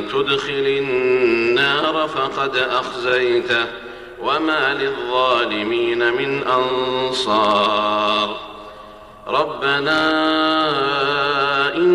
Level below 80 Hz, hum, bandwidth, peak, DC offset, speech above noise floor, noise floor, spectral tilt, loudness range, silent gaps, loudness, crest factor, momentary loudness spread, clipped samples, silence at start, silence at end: -52 dBFS; none; 12 kHz; -4 dBFS; under 0.1%; 21 dB; -39 dBFS; -4.5 dB/octave; 1 LU; none; -18 LUFS; 14 dB; 6 LU; under 0.1%; 0 s; 0 s